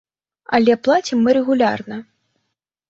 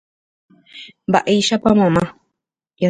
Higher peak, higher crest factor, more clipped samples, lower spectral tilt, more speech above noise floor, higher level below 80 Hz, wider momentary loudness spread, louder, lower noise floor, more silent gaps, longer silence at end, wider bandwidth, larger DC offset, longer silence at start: about the same, -2 dBFS vs 0 dBFS; about the same, 16 dB vs 18 dB; neither; about the same, -5 dB/octave vs -5.5 dB/octave; about the same, 60 dB vs 63 dB; second, -62 dBFS vs -48 dBFS; second, 14 LU vs 19 LU; about the same, -17 LUFS vs -16 LUFS; about the same, -76 dBFS vs -79 dBFS; neither; first, 0.9 s vs 0 s; second, 7.6 kHz vs 9.6 kHz; neither; second, 0.5 s vs 0.75 s